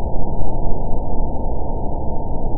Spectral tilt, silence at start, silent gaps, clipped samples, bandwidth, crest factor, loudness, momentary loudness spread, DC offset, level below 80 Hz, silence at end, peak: -17.5 dB/octave; 0 s; none; under 0.1%; 1.1 kHz; 10 dB; -26 LUFS; 1 LU; under 0.1%; -20 dBFS; 0 s; -2 dBFS